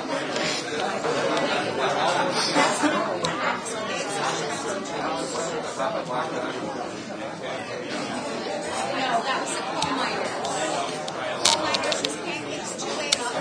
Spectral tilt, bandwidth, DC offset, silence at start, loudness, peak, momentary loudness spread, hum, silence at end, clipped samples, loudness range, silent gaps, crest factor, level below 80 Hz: -2.5 dB/octave; 11 kHz; under 0.1%; 0 s; -26 LUFS; 0 dBFS; 8 LU; none; 0 s; under 0.1%; 6 LU; none; 26 dB; -64 dBFS